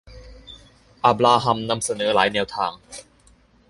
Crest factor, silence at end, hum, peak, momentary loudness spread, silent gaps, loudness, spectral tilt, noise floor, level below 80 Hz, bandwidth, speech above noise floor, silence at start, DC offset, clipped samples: 20 dB; 0.7 s; none; -2 dBFS; 23 LU; none; -20 LUFS; -3.5 dB/octave; -55 dBFS; -52 dBFS; 11.5 kHz; 35 dB; 0.05 s; under 0.1%; under 0.1%